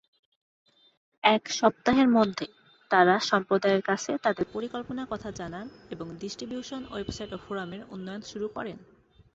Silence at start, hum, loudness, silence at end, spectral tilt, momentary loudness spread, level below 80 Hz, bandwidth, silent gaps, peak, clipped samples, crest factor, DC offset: 1.25 s; none; -27 LUFS; 0.55 s; -4.5 dB/octave; 17 LU; -60 dBFS; 8 kHz; none; -6 dBFS; under 0.1%; 24 dB; under 0.1%